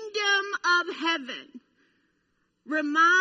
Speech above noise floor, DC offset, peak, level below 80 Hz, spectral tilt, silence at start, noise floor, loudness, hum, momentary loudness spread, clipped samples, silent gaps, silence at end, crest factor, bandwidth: 48 dB; under 0.1%; -12 dBFS; -86 dBFS; 0 dB/octave; 0 s; -73 dBFS; -25 LUFS; none; 11 LU; under 0.1%; none; 0 s; 16 dB; 8 kHz